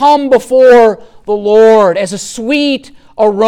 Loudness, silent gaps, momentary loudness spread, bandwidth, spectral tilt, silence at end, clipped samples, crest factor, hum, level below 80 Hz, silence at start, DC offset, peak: -9 LUFS; none; 13 LU; 13.5 kHz; -4.5 dB/octave; 0 s; under 0.1%; 8 dB; none; -46 dBFS; 0 s; under 0.1%; 0 dBFS